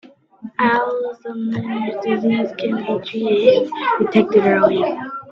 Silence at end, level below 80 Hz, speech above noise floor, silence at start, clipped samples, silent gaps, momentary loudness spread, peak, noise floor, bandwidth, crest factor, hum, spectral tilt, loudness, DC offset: 0 s; -62 dBFS; 20 dB; 0.4 s; under 0.1%; none; 11 LU; 0 dBFS; -38 dBFS; 6.6 kHz; 18 dB; none; -7.5 dB/octave; -18 LUFS; under 0.1%